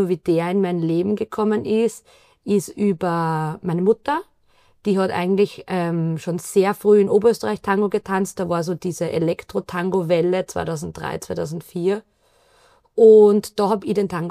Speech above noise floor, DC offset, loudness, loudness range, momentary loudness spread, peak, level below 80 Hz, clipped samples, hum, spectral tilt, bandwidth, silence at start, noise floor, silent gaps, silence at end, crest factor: 39 dB; under 0.1%; -20 LUFS; 5 LU; 12 LU; -2 dBFS; -56 dBFS; under 0.1%; none; -6.5 dB/octave; 15 kHz; 0 s; -58 dBFS; none; 0 s; 18 dB